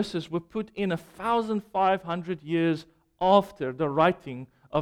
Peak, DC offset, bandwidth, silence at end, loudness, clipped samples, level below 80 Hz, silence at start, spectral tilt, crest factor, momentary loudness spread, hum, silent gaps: -8 dBFS; under 0.1%; 15 kHz; 0 s; -27 LUFS; under 0.1%; -60 dBFS; 0 s; -7 dB/octave; 20 dB; 12 LU; none; none